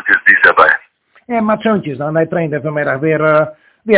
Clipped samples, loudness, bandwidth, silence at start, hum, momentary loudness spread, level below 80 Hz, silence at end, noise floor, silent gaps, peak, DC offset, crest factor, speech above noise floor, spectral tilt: 0.8%; -12 LUFS; 4 kHz; 0.05 s; none; 11 LU; -52 dBFS; 0 s; -48 dBFS; none; 0 dBFS; under 0.1%; 14 dB; 34 dB; -9.5 dB/octave